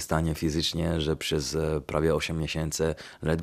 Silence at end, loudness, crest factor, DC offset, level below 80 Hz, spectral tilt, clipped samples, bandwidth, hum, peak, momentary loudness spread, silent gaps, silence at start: 0 s; -28 LUFS; 20 dB; under 0.1%; -44 dBFS; -5 dB/octave; under 0.1%; 15 kHz; none; -8 dBFS; 4 LU; none; 0 s